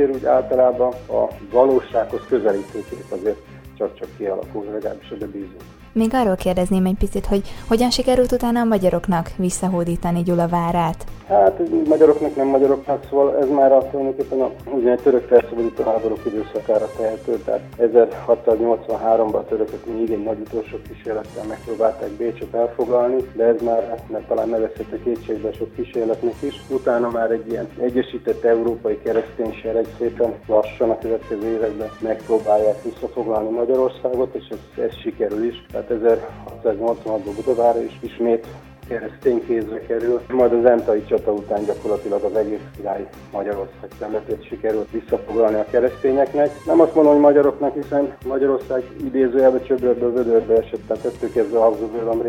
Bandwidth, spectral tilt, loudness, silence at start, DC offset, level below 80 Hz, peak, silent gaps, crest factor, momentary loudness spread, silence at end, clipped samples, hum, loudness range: 16.5 kHz; -6.5 dB/octave; -20 LUFS; 0 s; under 0.1%; -42 dBFS; 0 dBFS; none; 18 dB; 12 LU; 0 s; under 0.1%; none; 6 LU